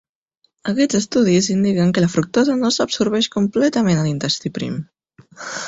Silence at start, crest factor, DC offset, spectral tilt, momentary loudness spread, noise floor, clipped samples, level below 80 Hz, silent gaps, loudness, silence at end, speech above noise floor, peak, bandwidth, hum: 0.65 s; 14 dB; under 0.1%; -5 dB/octave; 10 LU; -66 dBFS; under 0.1%; -54 dBFS; none; -18 LUFS; 0 s; 48 dB; -4 dBFS; 8 kHz; none